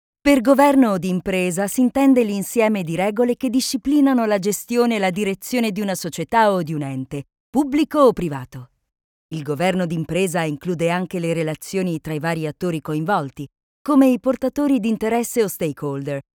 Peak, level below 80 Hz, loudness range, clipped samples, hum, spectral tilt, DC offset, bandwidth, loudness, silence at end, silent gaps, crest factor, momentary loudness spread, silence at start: -2 dBFS; -52 dBFS; 5 LU; under 0.1%; none; -5.5 dB/octave; under 0.1%; 18.5 kHz; -20 LUFS; 0.15 s; 7.40-7.53 s, 9.04-9.29 s, 13.63-13.85 s; 18 dB; 11 LU; 0.25 s